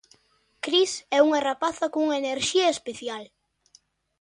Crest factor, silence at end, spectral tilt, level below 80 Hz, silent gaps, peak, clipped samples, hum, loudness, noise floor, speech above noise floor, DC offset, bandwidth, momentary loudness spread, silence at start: 20 dB; 0.95 s; -2 dB/octave; -68 dBFS; none; -6 dBFS; under 0.1%; none; -24 LUFS; -65 dBFS; 41 dB; under 0.1%; 11 kHz; 13 LU; 0.65 s